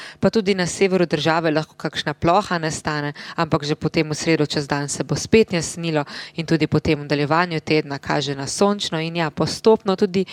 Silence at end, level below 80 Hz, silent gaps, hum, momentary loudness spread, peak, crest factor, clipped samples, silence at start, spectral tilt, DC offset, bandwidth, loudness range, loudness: 0 s; -48 dBFS; none; none; 7 LU; -2 dBFS; 18 dB; under 0.1%; 0 s; -5 dB/octave; under 0.1%; 14 kHz; 1 LU; -20 LUFS